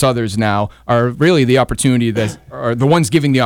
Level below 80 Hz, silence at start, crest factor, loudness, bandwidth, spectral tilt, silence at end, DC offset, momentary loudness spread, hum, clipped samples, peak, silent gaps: -38 dBFS; 0 s; 12 dB; -15 LUFS; 16.5 kHz; -6 dB/octave; 0 s; under 0.1%; 8 LU; none; under 0.1%; -2 dBFS; none